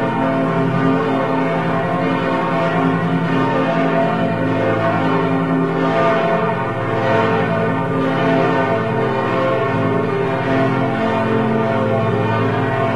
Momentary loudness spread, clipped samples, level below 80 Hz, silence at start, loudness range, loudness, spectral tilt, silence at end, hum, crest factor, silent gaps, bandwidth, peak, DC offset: 2 LU; under 0.1%; -48 dBFS; 0 s; 1 LU; -17 LUFS; -8 dB/octave; 0 s; none; 14 dB; none; 10.5 kHz; -2 dBFS; 1%